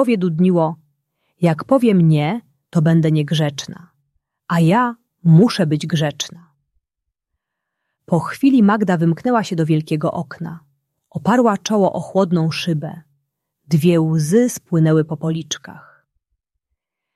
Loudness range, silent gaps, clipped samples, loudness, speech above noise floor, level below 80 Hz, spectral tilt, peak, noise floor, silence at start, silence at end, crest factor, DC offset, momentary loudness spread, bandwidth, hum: 3 LU; none; under 0.1%; -17 LUFS; 64 dB; -60 dBFS; -6.5 dB/octave; -2 dBFS; -80 dBFS; 0 s; 1.35 s; 16 dB; under 0.1%; 13 LU; 13 kHz; none